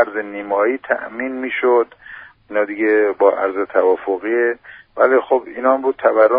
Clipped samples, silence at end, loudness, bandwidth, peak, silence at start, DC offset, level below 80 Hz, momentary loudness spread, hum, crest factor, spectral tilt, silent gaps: under 0.1%; 0 s; -17 LUFS; 4.4 kHz; 0 dBFS; 0 s; under 0.1%; -62 dBFS; 10 LU; none; 16 dB; -2.5 dB/octave; none